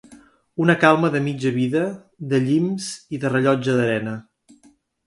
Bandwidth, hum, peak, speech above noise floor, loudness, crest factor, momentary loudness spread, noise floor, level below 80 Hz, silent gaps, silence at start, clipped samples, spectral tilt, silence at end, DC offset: 11.5 kHz; none; 0 dBFS; 37 dB; -20 LUFS; 22 dB; 14 LU; -56 dBFS; -62 dBFS; none; 0.1 s; under 0.1%; -6.5 dB/octave; 0.85 s; under 0.1%